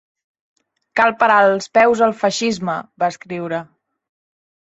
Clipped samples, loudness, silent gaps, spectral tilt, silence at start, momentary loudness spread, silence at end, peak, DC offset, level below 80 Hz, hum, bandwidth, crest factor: under 0.1%; -17 LUFS; none; -4 dB/octave; 0.95 s; 12 LU; 1.15 s; -2 dBFS; under 0.1%; -62 dBFS; none; 8 kHz; 18 dB